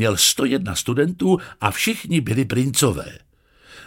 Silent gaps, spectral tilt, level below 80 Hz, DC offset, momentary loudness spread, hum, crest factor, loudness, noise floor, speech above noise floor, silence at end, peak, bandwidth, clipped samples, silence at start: none; -4 dB/octave; -48 dBFS; under 0.1%; 7 LU; none; 20 dB; -20 LUFS; -50 dBFS; 30 dB; 0 s; 0 dBFS; 17 kHz; under 0.1%; 0 s